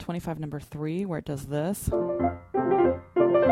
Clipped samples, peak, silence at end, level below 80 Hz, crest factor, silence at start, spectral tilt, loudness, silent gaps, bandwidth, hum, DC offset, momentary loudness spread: under 0.1%; -8 dBFS; 0 s; -48 dBFS; 18 dB; 0 s; -7 dB/octave; -27 LUFS; none; 16 kHz; none; under 0.1%; 11 LU